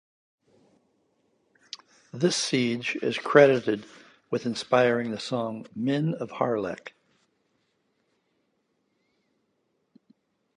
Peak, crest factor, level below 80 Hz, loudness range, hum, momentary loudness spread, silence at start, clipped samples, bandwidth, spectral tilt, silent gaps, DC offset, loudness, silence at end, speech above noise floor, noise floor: -2 dBFS; 26 dB; -74 dBFS; 10 LU; none; 23 LU; 2.15 s; under 0.1%; 11 kHz; -5 dB/octave; none; under 0.1%; -25 LUFS; 3.65 s; 49 dB; -74 dBFS